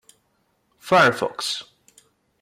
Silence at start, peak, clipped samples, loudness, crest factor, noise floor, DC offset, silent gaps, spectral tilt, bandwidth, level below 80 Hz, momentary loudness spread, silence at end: 0.85 s; -6 dBFS; under 0.1%; -20 LUFS; 18 dB; -68 dBFS; under 0.1%; none; -3.5 dB/octave; 16 kHz; -66 dBFS; 14 LU; 0.8 s